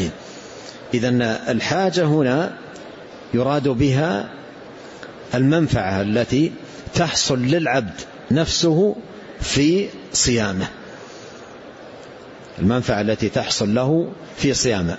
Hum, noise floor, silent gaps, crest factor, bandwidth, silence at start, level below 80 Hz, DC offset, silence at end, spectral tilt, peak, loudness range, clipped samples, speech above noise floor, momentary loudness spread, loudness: none; -39 dBFS; none; 14 dB; 8.2 kHz; 0 s; -44 dBFS; under 0.1%; 0 s; -5 dB/octave; -6 dBFS; 4 LU; under 0.1%; 20 dB; 21 LU; -20 LUFS